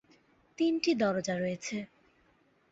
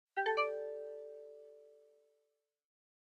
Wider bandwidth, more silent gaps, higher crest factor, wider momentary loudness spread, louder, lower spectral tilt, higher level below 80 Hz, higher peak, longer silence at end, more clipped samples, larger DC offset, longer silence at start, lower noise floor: about the same, 8 kHz vs 8.8 kHz; neither; about the same, 18 dB vs 22 dB; second, 11 LU vs 22 LU; first, -31 LUFS vs -38 LUFS; first, -5 dB/octave vs -2 dB/octave; first, -72 dBFS vs under -90 dBFS; first, -16 dBFS vs -22 dBFS; second, 0.85 s vs 1.25 s; neither; neither; first, 0.6 s vs 0.15 s; second, -68 dBFS vs -84 dBFS